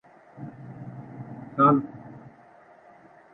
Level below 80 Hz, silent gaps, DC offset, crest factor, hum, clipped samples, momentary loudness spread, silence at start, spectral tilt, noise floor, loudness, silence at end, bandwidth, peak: -68 dBFS; none; under 0.1%; 22 dB; none; under 0.1%; 24 LU; 0.4 s; -10.5 dB/octave; -53 dBFS; -22 LUFS; 1.15 s; 3.9 kHz; -8 dBFS